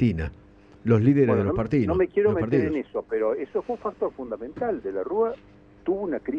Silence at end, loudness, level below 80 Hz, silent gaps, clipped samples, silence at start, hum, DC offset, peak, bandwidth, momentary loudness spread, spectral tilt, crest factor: 0 s; -25 LUFS; -46 dBFS; none; under 0.1%; 0 s; none; under 0.1%; -8 dBFS; 6.8 kHz; 12 LU; -10 dB/octave; 18 dB